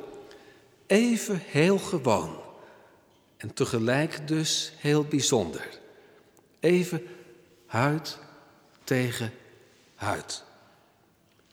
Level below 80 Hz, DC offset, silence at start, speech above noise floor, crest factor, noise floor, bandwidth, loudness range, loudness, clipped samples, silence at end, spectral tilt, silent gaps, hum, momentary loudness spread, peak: -66 dBFS; under 0.1%; 0 s; 37 dB; 22 dB; -63 dBFS; 18 kHz; 5 LU; -27 LUFS; under 0.1%; 1.1 s; -4.5 dB/octave; none; none; 19 LU; -8 dBFS